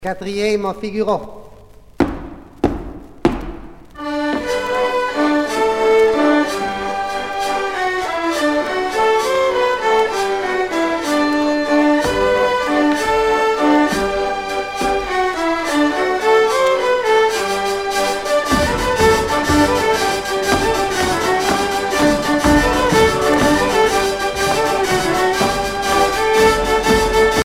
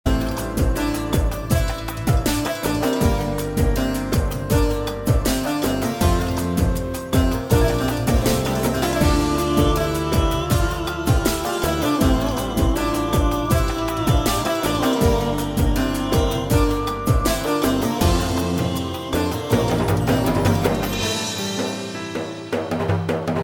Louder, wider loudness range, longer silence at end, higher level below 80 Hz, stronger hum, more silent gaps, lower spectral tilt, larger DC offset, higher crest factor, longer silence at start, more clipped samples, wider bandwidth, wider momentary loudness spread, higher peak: first, -16 LUFS vs -21 LUFS; first, 5 LU vs 2 LU; about the same, 0 s vs 0 s; second, -34 dBFS vs -26 dBFS; neither; neither; second, -4 dB/octave vs -5.5 dB/octave; neither; about the same, 16 dB vs 16 dB; about the same, 0 s vs 0.05 s; neither; second, 16.5 kHz vs 19 kHz; about the same, 7 LU vs 5 LU; first, 0 dBFS vs -4 dBFS